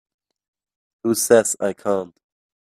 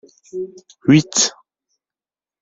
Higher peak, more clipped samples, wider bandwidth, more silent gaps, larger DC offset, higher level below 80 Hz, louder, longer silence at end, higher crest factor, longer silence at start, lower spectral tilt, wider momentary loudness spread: about the same, 0 dBFS vs -2 dBFS; neither; first, 16 kHz vs 8 kHz; neither; neither; second, -66 dBFS vs -58 dBFS; second, -19 LUFS vs -16 LUFS; second, 0.7 s vs 1.1 s; about the same, 22 dB vs 20 dB; first, 1.05 s vs 0.35 s; about the same, -3.5 dB/octave vs -4 dB/octave; second, 12 LU vs 19 LU